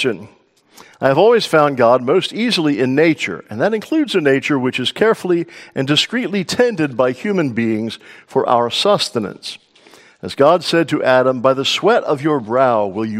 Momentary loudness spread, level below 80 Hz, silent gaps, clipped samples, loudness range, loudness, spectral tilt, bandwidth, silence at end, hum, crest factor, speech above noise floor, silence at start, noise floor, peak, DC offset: 10 LU; -62 dBFS; none; under 0.1%; 3 LU; -16 LUFS; -5 dB/octave; 16 kHz; 0 s; none; 16 dB; 31 dB; 0 s; -46 dBFS; 0 dBFS; under 0.1%